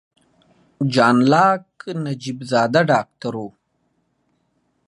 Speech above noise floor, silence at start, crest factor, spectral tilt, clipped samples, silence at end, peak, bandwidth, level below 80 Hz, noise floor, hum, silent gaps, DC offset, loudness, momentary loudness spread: 50 dB; 0.8 s; 18 dB; -6 dB/octave; under 0.1%; 1.4 s; -2 dBFS; 11.5 kHz; -66 dBFS; -68 dBFS; none; none; under 0.1%; -18 LUFS; 14 LU